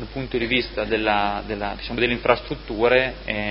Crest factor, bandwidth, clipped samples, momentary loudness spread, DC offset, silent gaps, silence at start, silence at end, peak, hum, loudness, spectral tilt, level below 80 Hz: 22 dB; 5.8 kHz; under 0.1%; 9 LU; under 0.1%; none; 0 s; 0 s; -2 dBFS; none; -22 LUFS; -9.5 dB/octave; -38 dBFS